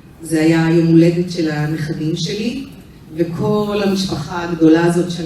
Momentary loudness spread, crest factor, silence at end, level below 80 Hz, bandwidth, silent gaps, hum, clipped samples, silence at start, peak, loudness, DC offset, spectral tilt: 11 LU; 16 dB; 0 s; -46 dBFS; 13.5 kHz; none; none; under 0.1%; 0.05 s; 0 dBFS; -16 LUFS; under 0.1%; -6.5 dB/octave